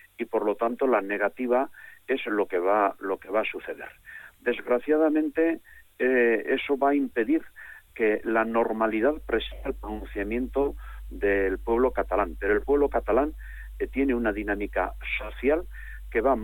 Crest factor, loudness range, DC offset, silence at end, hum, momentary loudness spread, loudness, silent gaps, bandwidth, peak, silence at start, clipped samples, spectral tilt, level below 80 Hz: 16 dB; 3 LU; under 0.1%; 0 s; none; 12 LU; -26 LUFS; none; 17.5 kHz; -10 dBFS; 0.2 s; under 0.1%; -7 dB/octave; -42 dBFS